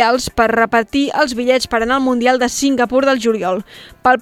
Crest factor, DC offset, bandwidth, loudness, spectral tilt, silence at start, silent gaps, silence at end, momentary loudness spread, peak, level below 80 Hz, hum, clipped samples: 14 dB; under 0.1%; 16 kHz; -15 LUFS; -3.5 dB/octave; 0 s; none; 0 s; 4 LU; 0 dBFS; -42 dBFS; none; under 0.1%